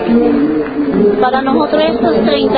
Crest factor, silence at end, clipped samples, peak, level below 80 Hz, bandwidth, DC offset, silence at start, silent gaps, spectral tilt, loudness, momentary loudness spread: 12 dB; 0 s; under 0.1%; 0 dBFS; -40 dBFS; 5 kHz; under 0.1%; 0 s; none; -10 dB/octave; -12 LUFS; 4 LU